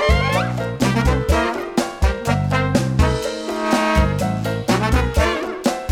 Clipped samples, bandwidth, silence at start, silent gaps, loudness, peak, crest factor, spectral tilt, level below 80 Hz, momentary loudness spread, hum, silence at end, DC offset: under 0.1%; 16.5 kHz; 0 s; none; -19 LUFS; -4 dBFS; 14 dB; -5.5 dB/octave; -24 dBFS; 5 LU; none; 0 s; under 0.1%